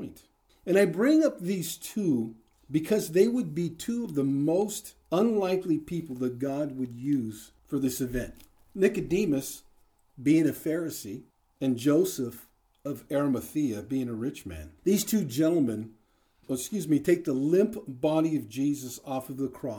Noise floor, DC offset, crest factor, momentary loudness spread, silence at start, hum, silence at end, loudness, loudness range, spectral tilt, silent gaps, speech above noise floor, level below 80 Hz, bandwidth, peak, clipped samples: -66 dBFS; under 0.1%; 20 dB; 14 LU; 0 s; none; 0 s; -28 LUFS; 3 LU; -6 dB/octave; none; 38 dB; -58 dBFS; over 20 kHz; -10 dBFS; under 0.1%